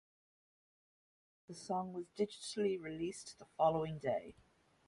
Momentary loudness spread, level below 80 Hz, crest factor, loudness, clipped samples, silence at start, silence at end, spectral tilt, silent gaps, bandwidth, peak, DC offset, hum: 17 LU; -74 dBFS; 22 dB; -39 LUFS; under 0.1%; 1.5 s; 0.55 s; -5.5 dB/octave; none; 11.5 kHz; -20 dBFS; under 0.1%; none